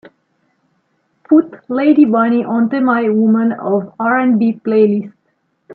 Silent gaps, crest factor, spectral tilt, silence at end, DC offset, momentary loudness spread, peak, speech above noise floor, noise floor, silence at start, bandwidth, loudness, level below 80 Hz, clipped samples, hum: none; 14 dB; -10.5 dB/octave; 0 s; under 0.1%; 7 LU; 0 dBFS; 51 dB; -64 dBFS; 1.3 s; 4.5 kHz; -14 LUFS; -68 dBFS; under 0.1%; none